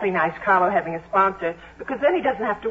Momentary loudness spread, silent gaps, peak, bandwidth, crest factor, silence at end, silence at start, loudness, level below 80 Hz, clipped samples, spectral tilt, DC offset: 11 LU; none; -6 dBFS; 7.8 kHz; 16 dB; 0 s; 0 s; -21 LUFS; -54 dBFS; under 0.1%; -7.5 dB/octave; under 0.1%